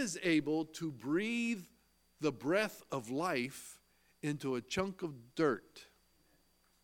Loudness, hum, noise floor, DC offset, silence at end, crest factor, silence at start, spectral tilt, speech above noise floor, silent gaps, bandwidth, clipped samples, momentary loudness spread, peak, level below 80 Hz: -37 LUFS; none; -72 dBFS; under 0.1%; 1 s; 20 dB; 0 s; -5 dB/octave; 36 dB; none; 17 kHz; under 0.1%; 10 LU; -18 dBFS; -72 dBFS